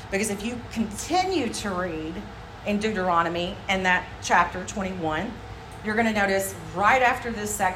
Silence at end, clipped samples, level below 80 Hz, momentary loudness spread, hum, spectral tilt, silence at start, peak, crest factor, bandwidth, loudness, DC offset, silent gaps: 0 s; under 0.1%; -46 dBFS; 13 LU; none; -4 dB/octave; 0 s; -6 dBFS; 18 dB; 16 kHz; -25 LUFS; under 0.1%; none